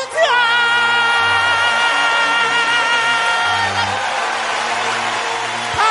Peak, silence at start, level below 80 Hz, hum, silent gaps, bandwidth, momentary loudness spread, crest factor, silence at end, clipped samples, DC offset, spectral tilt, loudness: -2 dBFS; 0 s; -54 dBFS; none; none; 11.5 kHz; 6 LU; 14 dB; 0 s; under 0.1%; under 0.1%; -1 dB/octave; -15 LUFS